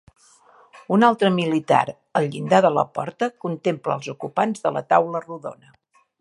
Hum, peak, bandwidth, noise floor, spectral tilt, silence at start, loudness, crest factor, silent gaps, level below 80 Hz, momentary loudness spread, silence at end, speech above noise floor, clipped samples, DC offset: none; -2 dBFS; 11.5 kHz; -53 dBFS; -6.5 dB/octave; 0.75 s; -21 LUFS; 20 dB; none; -70 dBFS; 11 LU; 0.65 s; 32 dB; under 0.1%; under 0.1%